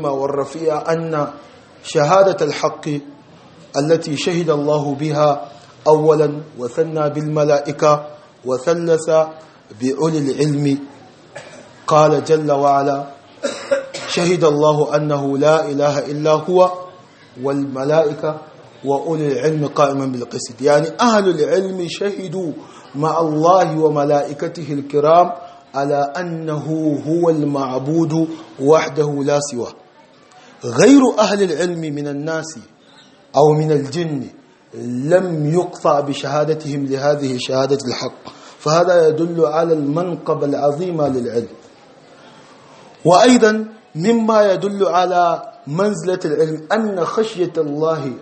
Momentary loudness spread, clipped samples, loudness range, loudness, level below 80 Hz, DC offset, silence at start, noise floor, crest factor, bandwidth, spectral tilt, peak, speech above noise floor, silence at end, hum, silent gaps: 12 LU; under 0.1%; 3 LU; -17 LUFS; -64 dBFS; under 0.1%; 0 s; -47 dBFS; 16 dB; 8.8 kHz; -6 dB/octave; 0 dBFS; 31 dB; 0 s; none; none